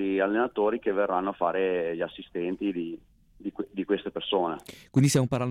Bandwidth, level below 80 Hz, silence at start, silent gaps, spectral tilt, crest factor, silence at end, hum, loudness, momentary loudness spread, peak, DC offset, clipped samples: 16 kHz; -60 dBFS; 0 s; none; -5.5 dB/octave; 16 dB; 0 s; none; -28 LUFS; 12 LU; -12 dBFS; under 0.1%; under 0.1%